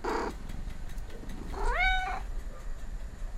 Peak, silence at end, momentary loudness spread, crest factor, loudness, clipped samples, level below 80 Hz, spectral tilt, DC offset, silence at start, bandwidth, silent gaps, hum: -16 dBFS; 0 s; 17 LU; 16 dB; -35 LUFS; under 0.1%; -36 dBFS; -4.5 dB/octave; under 0.1%; 0 s; 13 kHz; none; none